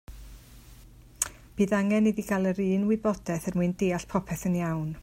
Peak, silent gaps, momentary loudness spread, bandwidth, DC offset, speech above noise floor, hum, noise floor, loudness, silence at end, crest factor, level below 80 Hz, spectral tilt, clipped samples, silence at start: -8 dBFS; none; 7 LU; 16 kHz; under 0.1%; 24 dB; none; -51 dBFS; -28 LUFS; 0 s; 20 dB; -50 dBFS; -6 dB/octave; under 0.1%; 0.1 s